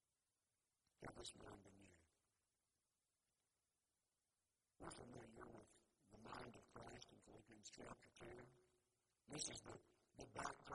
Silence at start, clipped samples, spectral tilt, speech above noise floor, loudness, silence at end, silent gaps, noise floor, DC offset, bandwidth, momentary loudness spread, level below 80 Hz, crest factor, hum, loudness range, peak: 1 s; under 0.1%; -3 dB/octave; over 33 dB; -58 LUFS; 0 s; none; under -90 dBFS; under 0.1%; 11.5 kHz; 14 LU; -78 dBFS; 28 dB; none; 8 LU; -34 dBFS